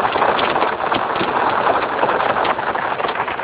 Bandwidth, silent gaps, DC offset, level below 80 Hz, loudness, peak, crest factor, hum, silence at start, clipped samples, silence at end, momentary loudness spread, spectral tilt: 4 kHz; none; under 0.1%; -50 dBFS; -18 LUFS; -2 dBFS; 16 dB; none; 0 s; under 0.1%; 0 s; 4 LU; -8 dB/octave